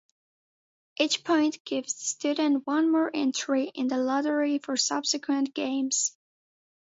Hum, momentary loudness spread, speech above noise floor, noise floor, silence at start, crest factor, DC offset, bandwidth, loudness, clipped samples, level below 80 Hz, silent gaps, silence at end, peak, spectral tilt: none; 5 LU; over 63 dB; under -90 dBFS; 1 s; 18 dB; under 0.1%; 8 kHz; -27 LUFS; under 0.1%; -80 dBFS; 1.60-1.65 s; 0.75 s; -10 dBFS; -1 dB/octave